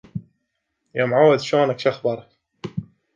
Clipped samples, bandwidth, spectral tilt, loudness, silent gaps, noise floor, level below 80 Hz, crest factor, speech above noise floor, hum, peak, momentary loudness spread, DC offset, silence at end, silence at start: under 0.1%; 7.6 kHz; -6 dB/octave; -19 LUFS; none; -75 dBFS; -60 dBFS; 18 dB; 57 dB; none; -4 dBFS; 19 LU; under 0.1%; 0.35 s; 0.15 s